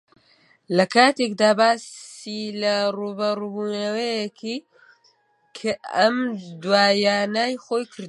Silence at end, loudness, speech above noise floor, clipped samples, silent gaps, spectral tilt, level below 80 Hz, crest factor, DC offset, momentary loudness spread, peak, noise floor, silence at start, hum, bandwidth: 0 s; -22 LUFS; 40 dB; under 0.1%; none; -4 dB/octave; -74 dBFS; 20 dB; under 0.1%; 14 LU; -2 dBFS; -62 dBFS; 0.7 s; none; 11.5 kHz